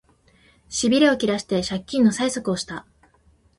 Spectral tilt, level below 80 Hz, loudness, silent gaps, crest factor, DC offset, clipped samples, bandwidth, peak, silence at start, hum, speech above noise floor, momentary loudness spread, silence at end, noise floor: -4 dB/octave; -54 dBFS; -21 LUFS; none; 18 dB; under 0.1%; under 0.1%; 11.5 kHz; -6 dBFS; 0.7 s; none; 38 dB; 12 LU; 0.75 s; -59 dBFS